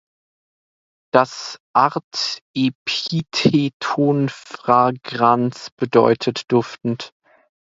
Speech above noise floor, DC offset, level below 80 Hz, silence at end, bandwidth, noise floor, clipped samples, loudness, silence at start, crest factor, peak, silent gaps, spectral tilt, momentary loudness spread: over 71 dB; under 0.1%; -60 dBFS; 0.65 s; 7.8 kHz; under -90 dBFS; under 0.1%; -19 LUFS; 1.15 s; 20 dB; 0 dBFS; 1.60-1.74 s, 2.04-2.11 s, 2.41-2.54 s, 2.75-2.86 s, 3.74-3.80 s, 5.72-5.77 s; -5.5 dB/octave; 10 LU